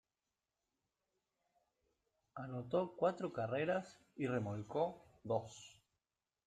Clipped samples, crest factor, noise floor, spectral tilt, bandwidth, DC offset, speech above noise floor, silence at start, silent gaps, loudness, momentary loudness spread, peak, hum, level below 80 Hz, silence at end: under 0.1%; 20 dB; under -90 dBFS; -7 dB/octave; 9.4 kHz; under 0.1%; over 50 dB; 2.35 s; none; -41 LUFS; 18 LU; -24 dBFS; none; -78 dBFS; 0.75 s